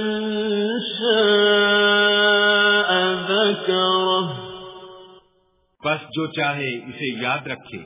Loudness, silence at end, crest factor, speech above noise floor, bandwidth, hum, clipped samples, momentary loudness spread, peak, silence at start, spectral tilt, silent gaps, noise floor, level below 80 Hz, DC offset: -19 LUFS; 0 s; 14 dB; 38 dB; 3.9 kHz; none; under 0.1%; 13 LU; -6 dBFS; 0 s; -8 dB/octave; none; -64 dBFS; -62 dBFS; under 0.1%